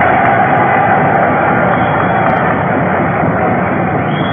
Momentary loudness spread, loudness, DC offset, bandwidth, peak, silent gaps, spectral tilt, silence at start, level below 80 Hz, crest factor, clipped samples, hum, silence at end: 4 LU; -11 LUFS; under 0.1%; 3.7 kHz; 0 dBFS; none; -10.5 dB/octave; 0 s; -42 dBFS; 12 dB; under 0.1%; none; 0 s